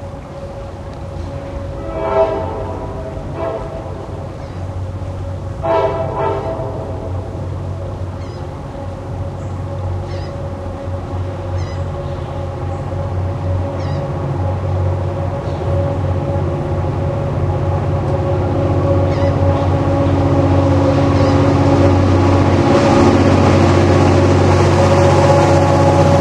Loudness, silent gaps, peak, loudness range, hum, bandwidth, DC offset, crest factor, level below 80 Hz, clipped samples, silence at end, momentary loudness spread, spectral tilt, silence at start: -16 LUFS; none; 0 dBFS; 13 LU; none; 9.6 kHz; under 0.1%; 16 dB; -32 dBFS; under 0.1%; 0 s; 15 LU; -7.5 dB/octave; 0 s